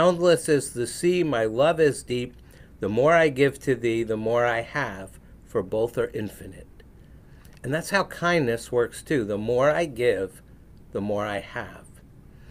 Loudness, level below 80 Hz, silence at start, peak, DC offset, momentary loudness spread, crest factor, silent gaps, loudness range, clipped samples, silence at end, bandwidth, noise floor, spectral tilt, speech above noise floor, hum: -24 LUFS; -50 dBFS; 0 s; -6 dBFS; under 0.1%; 15 LU; 18 dB; none; 6 LU; under 0.1%; 0 s; 16 kHz; -49 dBFS; -5.5 dB/octave; 25 dB; none